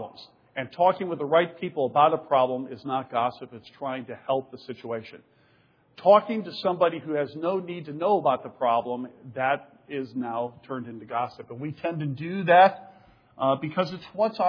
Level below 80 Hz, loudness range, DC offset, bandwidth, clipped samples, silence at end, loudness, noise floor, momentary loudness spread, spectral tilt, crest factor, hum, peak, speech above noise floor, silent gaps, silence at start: -74 dBFS; 6 LU; under 0.1%; 5.4 kHz; under 0.1%; 0 s; -26 LUFS; -62 dBFS; 16 LU; -8 dB/octave; 20 dB; none; -6 dBFS; 37 dB; none; 0 s